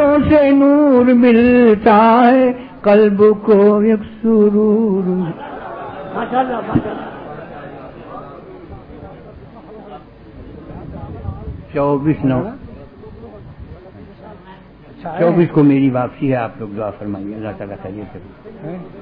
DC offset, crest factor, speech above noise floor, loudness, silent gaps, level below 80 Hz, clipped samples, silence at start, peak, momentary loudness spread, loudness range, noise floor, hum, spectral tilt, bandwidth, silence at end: under 0.1%; 14 dB; 26 dB; -13 LUFS; none; -42 dBFS; under 0.1%; 0 s; 0 dBFS; 24 LU; 22 LU; -39 dBFS; none; -11 dB/octave; 5 kHz; 0 s